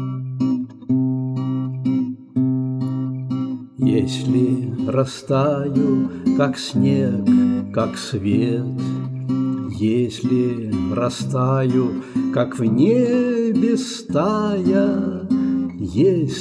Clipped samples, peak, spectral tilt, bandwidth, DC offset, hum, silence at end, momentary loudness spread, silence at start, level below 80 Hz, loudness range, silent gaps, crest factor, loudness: under 0.1%; -6 dBFS; -7.5 dB/octave; 11 kHz; under 0.1%; none; 0 s; 7 LU; 0 s; -54 dBFS; 3 LU; none; 14 dB; -20 LUFS